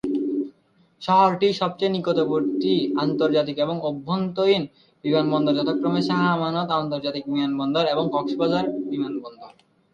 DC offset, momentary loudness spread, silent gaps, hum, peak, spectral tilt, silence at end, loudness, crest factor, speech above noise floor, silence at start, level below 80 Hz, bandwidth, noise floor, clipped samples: under 0.1%; 7 LU; none; none; -6 dBFS; -7.5 dB/octave; 0.45 s; -23 LUFS; 16 dB; 38 dB; 0.05 s; -64 dBFS; 7.4 kHz; -60 dBFS; under 0.1%